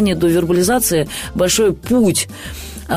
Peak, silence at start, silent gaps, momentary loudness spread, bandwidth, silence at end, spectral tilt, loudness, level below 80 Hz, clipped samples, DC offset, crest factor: -4 dBFS; 0 s; none; 13 LU; 16 kHz; 0 s; -4 dB/octave; -15 LUFS; -36 dBFS; under 0.1%; under 0.1%; 12 dB